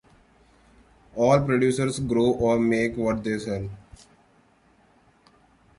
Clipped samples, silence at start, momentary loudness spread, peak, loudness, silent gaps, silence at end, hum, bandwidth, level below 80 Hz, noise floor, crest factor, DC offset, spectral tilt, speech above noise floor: under 0.1%; 1.15 s; 13 LU; -8 dBFS; -23 LUFS; none; 2.05 s; none; 11.5 kHz; -50 dBFS; -60 dBFS; 18 dB; under 0.1%; -6.5 dB/octave; 37 dB